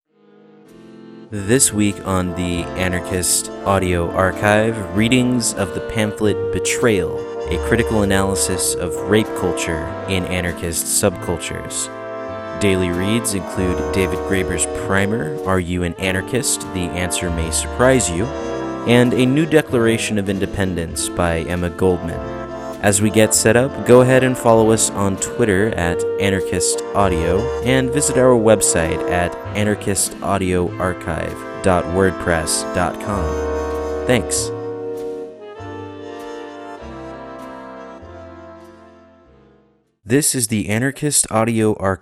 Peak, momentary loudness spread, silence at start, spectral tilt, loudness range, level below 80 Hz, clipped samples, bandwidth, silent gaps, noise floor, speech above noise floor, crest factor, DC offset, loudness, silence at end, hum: 0 dBFS; 14 LU; 0.75 s; -4.5 dB/octave; 8 LU; -36 dBFS; under 0.1%; 15.5 kHz; none; -57 dBFS; 40 dB; 18 dB; under 0.1%; -18 LUFS; 0.05 s; none